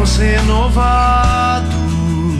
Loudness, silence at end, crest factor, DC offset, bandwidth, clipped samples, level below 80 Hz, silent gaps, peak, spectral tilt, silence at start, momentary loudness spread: -14 LUFS; 0 s; 10 dB; under 0.1%; 11.5 kHz; under 0.1%; -16 dBFS; none; -2 dBFS; -5.5 dB/octave; 0 s; 5 LU